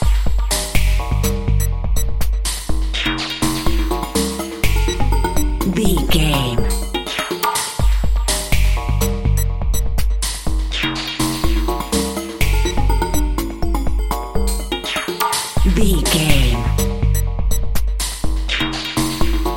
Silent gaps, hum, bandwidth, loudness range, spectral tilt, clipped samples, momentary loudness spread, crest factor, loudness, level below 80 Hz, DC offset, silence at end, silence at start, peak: none; none; 17 kHz; 2 LU; -4 dB/octave; under 0.1%; 5 LU; 16 dB; -19 LUFS; -20 dBFS; under 0.1%; 0 s; 0 s; 0 dBFS